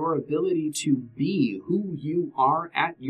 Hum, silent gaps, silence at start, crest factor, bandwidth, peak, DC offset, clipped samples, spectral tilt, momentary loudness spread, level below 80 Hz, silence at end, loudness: none; none; 0 s; 18 dB; 13.5 kHz; -6 dBFS; under 0.1%; under 0.1%; -5.5 dB/octave; 5 LU; -68 dBFS; 0 s; -26 LUFS